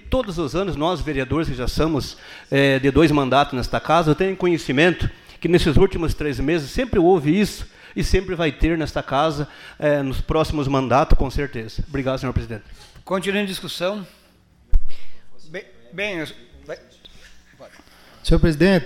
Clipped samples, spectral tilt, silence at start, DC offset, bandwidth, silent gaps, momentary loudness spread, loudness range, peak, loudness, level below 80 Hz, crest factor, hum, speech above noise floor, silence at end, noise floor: under 0.1%; -6 dB/octave; 0.05 s; under 0.1%; 15 kHz; none; 16 LU; 12 LU; -4 dBFS; -21 LUFS; -28 dBFS; 16 dB; none; 35 dB; 0 s; -54 dBFS